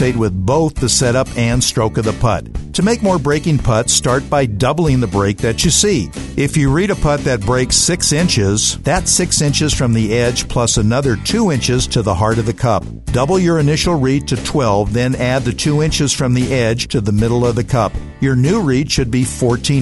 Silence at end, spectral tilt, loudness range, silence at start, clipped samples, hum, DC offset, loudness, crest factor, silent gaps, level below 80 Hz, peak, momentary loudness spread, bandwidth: 0 s; -4.5 dB/octave; 2 LU; 0 s; under 0.1%; none; under 0.1%; -15 LUFS; 14 dB; none; -28 dBFS; 0 dBFS; 4 LU; 12 kHz